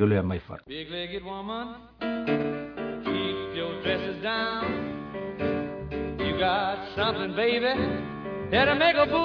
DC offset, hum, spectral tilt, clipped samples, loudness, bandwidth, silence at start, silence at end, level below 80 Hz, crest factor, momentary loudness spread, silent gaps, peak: under 0.1%; none; -8 dB/octave; under 0.1%; -28 LUFS; 5.4 kHz; 0 s; 0 s; -50 dBFS; 20 dB; 12 LU; none; -8 dBFS